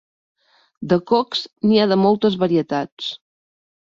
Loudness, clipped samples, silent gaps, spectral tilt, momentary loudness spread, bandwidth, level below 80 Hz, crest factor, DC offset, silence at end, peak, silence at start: -19 LUFS; under 0.1%; 2.92-2.97 s; -7 dB/octave; 13 LU; 7.4 kHz; -60 dBFS; 16 dB; under 0.1%; 0.7 s; -4 dBFS; 0.8 s